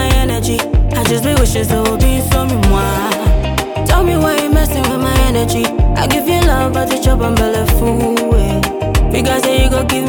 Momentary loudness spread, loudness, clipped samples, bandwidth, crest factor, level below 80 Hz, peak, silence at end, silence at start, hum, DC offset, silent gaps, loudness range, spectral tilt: 3 LU; -14 LUFS; under 0.1%; over 20 kHz; 12 dB; -16 dBFS; 0 dBFS; 0 s; 0 s; none; under 0.1%; none; 0 LU; -5 dB/octave